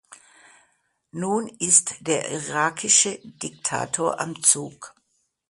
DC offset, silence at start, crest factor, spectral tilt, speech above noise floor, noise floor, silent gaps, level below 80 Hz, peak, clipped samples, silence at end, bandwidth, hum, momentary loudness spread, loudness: under 0.1%; 0.1 s; 24 dB; -1.5 dB/octave; 47 dB; -71 dBFS; none; -68 dBFS; -2 dBFS; under 0.1%; 0.6 s; 11.5 kHz; none; 15 LU; -21 LUFS